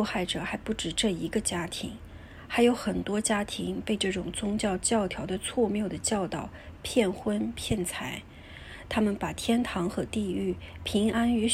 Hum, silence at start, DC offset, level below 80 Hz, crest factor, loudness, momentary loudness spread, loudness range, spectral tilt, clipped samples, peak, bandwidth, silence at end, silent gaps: none; 0 s; under 0.1%; -48 dBFS; 20 dB; -29 LUFS; 11 LU; 3 LU; -4 dB/octave; under 0.1%; -10 dBFS; 15.5 kHz; 0 s; none